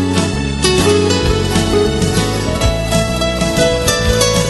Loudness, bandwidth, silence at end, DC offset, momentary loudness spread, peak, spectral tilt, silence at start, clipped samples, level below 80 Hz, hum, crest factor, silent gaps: -14 LUFS; 12.5 kHz; 0 s; under 0.1%; 4 LU; 0 dBFS; -4.5 dB/octave; 0 s; under 0.1%; -24 dBFS; none; 14 dB; none